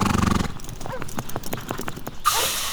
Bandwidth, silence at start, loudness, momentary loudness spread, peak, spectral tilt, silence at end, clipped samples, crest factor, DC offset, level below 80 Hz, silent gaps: over 20 kHz; 0 s; -26 LUFS; 13 LU; -6 dBFS; -3.5 dB/octave; 0 s; under 0.1%; 18 dB; under 0.1%; -36 dBFS; none